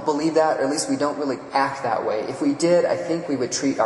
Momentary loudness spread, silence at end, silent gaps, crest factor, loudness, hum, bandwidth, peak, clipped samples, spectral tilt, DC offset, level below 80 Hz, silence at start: 6 LU; 0 s; none; 16 dB; -22 LUFS; none; 11.5 kHz; -6 dBFS; under 0.1%; -4.5 dB/octave; under 0.1%; -64 dBFS; 0 s